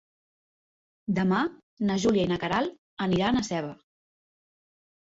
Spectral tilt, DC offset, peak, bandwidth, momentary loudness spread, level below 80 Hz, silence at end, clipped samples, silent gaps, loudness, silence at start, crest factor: -6 dB/octave; under 0.1%; -12 dBFS; 8 kHz; 9 LU; -56 dBFS; 1.3 s; under 0.1%; 1.63-1.77 s, 2.78-2.97 s; -27 LUFS; 1.1 s; 16 dB